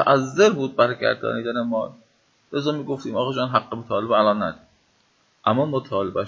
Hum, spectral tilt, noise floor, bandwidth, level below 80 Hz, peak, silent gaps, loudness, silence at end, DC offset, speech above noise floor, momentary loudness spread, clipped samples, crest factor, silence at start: none; -5.5 dB/octave; -63 dBFS; 7.6 kHz; -60 dBFS; -2 dBFS; none; -22 LUFS; 0 s; under 0.1%; 41 dB; 9 LU; under 0.1%; 20 dB; 0 s